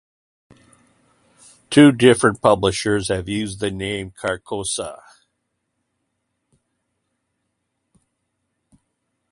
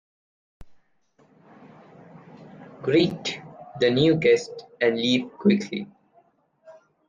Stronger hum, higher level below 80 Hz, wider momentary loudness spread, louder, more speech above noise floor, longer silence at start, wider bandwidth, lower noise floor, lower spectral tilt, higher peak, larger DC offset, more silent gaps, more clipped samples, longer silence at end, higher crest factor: neither; first, -50 dBFS vs -62 dBFS; second, 14 LU vs 21 LU; first, -18 LUFS vs -23 LUFS; first, 57 dB vs 40 dB; first, 1.7 s vs 0.6 s; first, 11.5 kHz vs 9.2 kHz; first, -75 dBFS vs -62 dBFS; about the same, -5 dB/octave vs -6 dB/octave; first, 0 dBFS vs -6 dBFS; neither; neither; neither; first, 4.35 s vs 0.35 s; about the same, 22 dB vs 20 dB